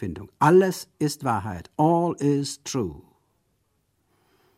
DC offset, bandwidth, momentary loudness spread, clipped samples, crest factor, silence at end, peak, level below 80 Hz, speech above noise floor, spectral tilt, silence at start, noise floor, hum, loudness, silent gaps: under 0.1%; 15.5 kHz; 12 LU; under 0.1%; 20 dB; 1.6 s; -4 dBFS; -56 dBFS; 48 dB; -6 dB/octave; 0 s; -71 dBFS; none; -23 LUFS; none